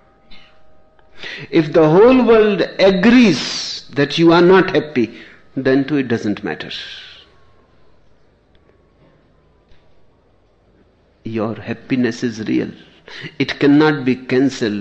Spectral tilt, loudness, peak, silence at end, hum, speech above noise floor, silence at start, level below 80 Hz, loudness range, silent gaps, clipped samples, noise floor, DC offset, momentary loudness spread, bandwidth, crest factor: -6 dB/octave; -15 LUFS; -2 dBFS; 0 s; none; 41 dB; 0.3 s; -48 dBFS; 18 LU; none; under 0.1%; -55 dBFS; under 0.1%; 19 LU; 8.4 kHz; 16 dB